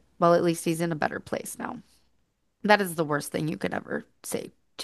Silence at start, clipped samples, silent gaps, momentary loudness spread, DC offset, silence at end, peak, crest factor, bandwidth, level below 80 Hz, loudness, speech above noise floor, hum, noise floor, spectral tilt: 0.2 s; under 0.1%; none; 13 LU; under 0.1%; 0 s; -2 dBFS; 26 dB; 13 kHz; -66 dBFS; -27 LUFS; 45 dB; none; -72 dBFS; -5 dB/octave